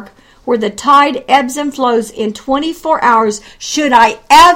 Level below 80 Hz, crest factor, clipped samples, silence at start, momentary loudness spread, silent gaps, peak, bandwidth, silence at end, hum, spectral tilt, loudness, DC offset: -44 dBFS; 12 dB; 0.7%; 0 s; 10 LU; none; 0 dBFS; 17 kHz; 0 s; none; -2.5 dB/octave; -12 LUFS; under 0.1%